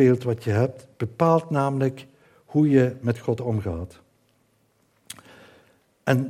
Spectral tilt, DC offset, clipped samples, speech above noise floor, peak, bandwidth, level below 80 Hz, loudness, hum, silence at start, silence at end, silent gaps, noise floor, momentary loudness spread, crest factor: -8 dB/octave; under 0.1%; under 0.1%; 43 dB; -4 dBFS; 14.5 kHz; -58 dBFS; -24 LUFS; none; 0 s; 0 s; none; -65 dBFS; 22 LU; 20 dB